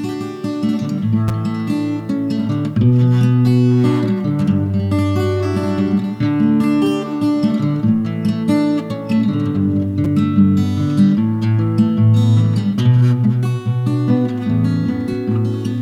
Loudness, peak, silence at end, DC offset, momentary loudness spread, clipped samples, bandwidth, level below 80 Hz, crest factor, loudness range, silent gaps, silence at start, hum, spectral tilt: -16 LUFS; -2 dBFS; 0 s; under 0.1%; 6 LU; under 0.1%; 12 kHz; -48 dBFS; 14 dB; 2 LU; none; 0 s; none; -8.5 dB/octave